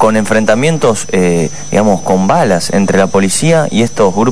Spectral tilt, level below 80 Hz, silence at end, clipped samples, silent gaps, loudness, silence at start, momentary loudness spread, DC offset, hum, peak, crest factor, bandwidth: -5 dB/octave; -42 dBFS; 0 s; 0.4%; none; -11 LUFS; 0 s; 3 LU; 7%; none; 0 dBFS; 10 dB; 11 kHz